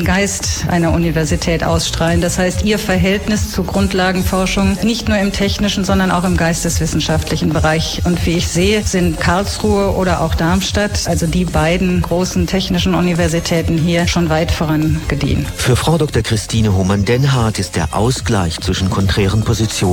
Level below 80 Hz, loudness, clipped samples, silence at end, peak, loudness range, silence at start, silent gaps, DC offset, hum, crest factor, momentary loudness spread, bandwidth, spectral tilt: -26 dBFS; -15 LUFS; under 0.1%; 0 s; -2 dBFS; 0 LU; 0 s; none; under 0.1%; none; 12 dB; 3 LU; 18.5 kHz; -5 dB/octave